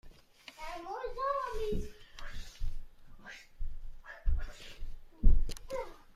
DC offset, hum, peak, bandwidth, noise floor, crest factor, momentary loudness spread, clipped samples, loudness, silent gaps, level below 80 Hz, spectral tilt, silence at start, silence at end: under 0.1%; none; -10 dBFS; 7.4 kHz; -56 dBFS; 22 dB; 18 LU; under 0.1%; -39 LUFS; none; -36 dBFS; -6 dB/octave; 0.05 s; 0.25 s